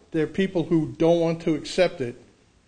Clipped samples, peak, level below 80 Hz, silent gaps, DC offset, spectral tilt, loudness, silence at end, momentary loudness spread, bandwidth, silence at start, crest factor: under 0.1%; -8 dBFS; -52 dBFS; none; under 0.1%; -6.5 dB/octave; -24 LUFS; 0.55 s; 6 LU; 9.6 kHz; 0.15 s; 16 dB